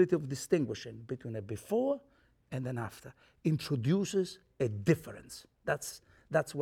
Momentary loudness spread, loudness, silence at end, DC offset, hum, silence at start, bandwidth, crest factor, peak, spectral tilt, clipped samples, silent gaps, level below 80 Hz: 13 LU; -34 LUFS; 0 s; under 0.1%; none; 0 s; 17 kHz; 22 dB; -12 dBFS; -6 dB/octave; under 0.1%; none; -66 dBFS